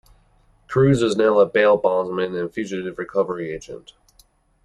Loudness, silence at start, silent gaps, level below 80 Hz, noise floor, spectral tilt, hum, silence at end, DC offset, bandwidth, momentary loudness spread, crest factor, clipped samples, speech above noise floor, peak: -20 LUFS; 0.7 s; none; -52 dBFS; -57 dBFS; -6.5 dB/octave; none; 0.85 s; under 0.1%; 11.5 kHz; 14 LU; 16 dB; under 0.1%; 38 dB; -4 dBFS